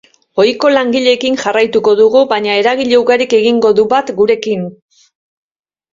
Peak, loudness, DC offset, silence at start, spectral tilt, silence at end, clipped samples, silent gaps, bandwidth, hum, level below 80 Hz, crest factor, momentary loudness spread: 0 dBFS; -11 LUFS; under 0.1%; 0.35 s; -4.5 dB/octave; 1.2 s; under 0.1%; none; 7.6 kHz; none; -56 dBFS; 12 dB; 5 LU